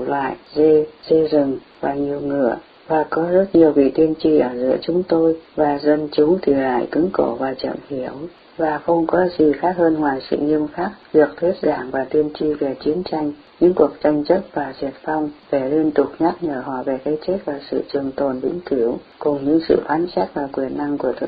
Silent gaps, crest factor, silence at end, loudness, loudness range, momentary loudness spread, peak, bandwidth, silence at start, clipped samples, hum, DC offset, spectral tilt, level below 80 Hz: none; 18 dB; 0 s; -19 LUFS; 4 LU; 9 LU; -2 dBFS; 5 kHz; 0 s; under 0.1%; none; under 0.1%; -11 dB/octave; -50 dBFS